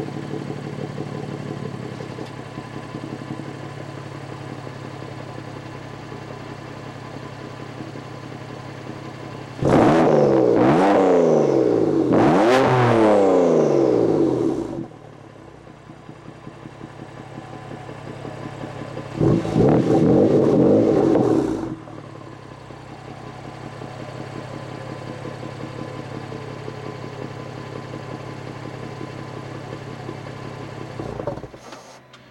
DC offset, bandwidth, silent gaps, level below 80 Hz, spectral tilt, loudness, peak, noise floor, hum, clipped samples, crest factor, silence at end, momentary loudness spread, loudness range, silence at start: under 0.1%; 11.5 kHz; none; -50 dBFS; -7.5 dB/octave; -19 LUFS; -2 dBFS; -44 dBFS; none; under 0.1%; 20 dB; 0.15 s; 22 LU; 18 LU; 0 s